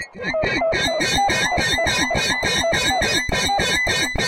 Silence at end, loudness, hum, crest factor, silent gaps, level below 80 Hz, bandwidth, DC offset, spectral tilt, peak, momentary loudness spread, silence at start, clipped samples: 0 s; -18 LUFS; none; 14 dB; none; -36 dBFS; 16.5 kHz; under 0.1%; -2.5 dB/octave; -6 dBFS; 2 LU; 0 s; under 0.1%